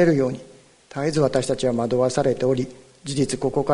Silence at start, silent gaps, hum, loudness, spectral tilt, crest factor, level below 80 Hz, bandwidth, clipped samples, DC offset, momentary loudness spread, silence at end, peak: 0 s; none; none; -22 LUFS; -6 dB/octave; 18 dB; -50 dBFS; 11 kHz; under 0.1%; under 0.1%; 12 LU; 0 s; -4 dBFS